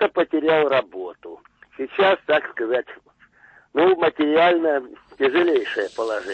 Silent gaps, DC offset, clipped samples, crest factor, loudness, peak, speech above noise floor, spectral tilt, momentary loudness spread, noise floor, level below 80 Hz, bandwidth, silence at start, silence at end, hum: none; under 0.1%; under 0.1%; 14 dB; -20 LUFS; -6 dBFS; 33 dB; -5.5 dB/octave; 16 LU; -54 dBFS; -66 dBFS; 8.6 kHz; 0 s; 0 s; none